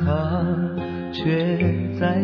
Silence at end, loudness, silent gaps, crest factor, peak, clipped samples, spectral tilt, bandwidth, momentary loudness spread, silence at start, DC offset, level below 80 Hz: 0 s; -23 LUFS; none; 14 dB; -8 dBFS; under 0.1%; -9.5 dB/octave; 5.4 kHz; 6 LU; 0 s; under 0.1%; -44 dBFS